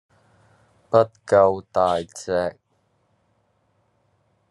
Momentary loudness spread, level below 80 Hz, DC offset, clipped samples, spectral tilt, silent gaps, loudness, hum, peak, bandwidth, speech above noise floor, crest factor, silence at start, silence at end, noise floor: 9 LU; -66 dBFS; under 0.1%; under 0.1%; -5.5 dB/octave; none; -21 LUFS; none; -2 dBFS; 11.5 kHz; 47 dB; 22 dB; 0.9 s; 2 s; -67 dBFS